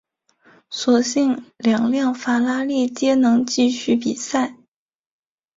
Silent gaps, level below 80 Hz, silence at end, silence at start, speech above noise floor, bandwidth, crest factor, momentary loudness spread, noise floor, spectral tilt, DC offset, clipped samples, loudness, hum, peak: none; -64 dBFS; 1.05 s; 0.7 s; 57 dB; 7.8 kHz; 16 dB; 6 LU; -75 dBFS; -4 dB/octave; under 0.1%; under 0.1%; -19 LUFS; none; -4 dBFS